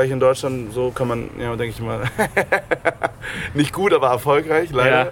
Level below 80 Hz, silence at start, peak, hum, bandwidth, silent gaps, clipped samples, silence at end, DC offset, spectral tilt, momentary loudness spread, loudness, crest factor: -44 dBFS; 0 s; -2 dBFS; none; 17 kHz; none; under 0.1%; 0 s; under 0.1%; -5.5 dB/octave; 9 LU; -20 LUFS; 18 dB